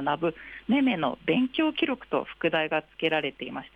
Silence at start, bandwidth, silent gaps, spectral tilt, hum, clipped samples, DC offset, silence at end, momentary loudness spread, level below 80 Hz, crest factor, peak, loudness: 0 s; 4.9 kHz; none; -7.5 dB/octave; none; under 0.1%; under 0.1%; 0.1 s; 7 LU; -62 dBFS; 16 dB; -12 dBFS; -27 LUFS